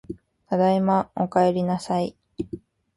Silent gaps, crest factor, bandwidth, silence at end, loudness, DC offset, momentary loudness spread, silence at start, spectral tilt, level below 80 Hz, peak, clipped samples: none; 16 dB; 11.5 kHz; 0.4 s; -23 LUFS; under 0.1%; 18 LU; 0.1 s; -7.5 dB/octave; -56 dBFS; -8 dBFS; under 0.1%